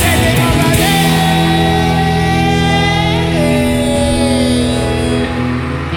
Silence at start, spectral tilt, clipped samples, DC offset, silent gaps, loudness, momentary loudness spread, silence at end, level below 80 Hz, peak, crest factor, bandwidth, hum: 0 s; -5 dB/octave; under 0.1%; under 0.1%; none; -12 LUFS; 4 LU; 0 s; -24 dBFS; 0 dBFS; 10 dB; over 20 kHz; none